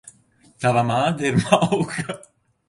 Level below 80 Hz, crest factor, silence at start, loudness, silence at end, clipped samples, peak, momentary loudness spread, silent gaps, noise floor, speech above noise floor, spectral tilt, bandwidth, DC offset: -54 dBFS; 20 dB; 0.05 s; -20 LUFS; 0.5 s; under 0.1%; -2 dBFS; 12 LU; none; -56 dBFS; 36 dB; -5.5 dB/octave; 11.5 kHz; under 0.1%